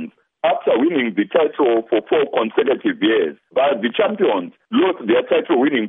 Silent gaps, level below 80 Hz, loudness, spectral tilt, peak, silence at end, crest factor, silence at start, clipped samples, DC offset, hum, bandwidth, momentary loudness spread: none; -72 dBFS; -18 LUFS; -9 dB/octave; -4 dBFS; 0 s; 14 dB; 0 s; under 0.1%; under 0.1%; none; 3.9 kHz; 3 LU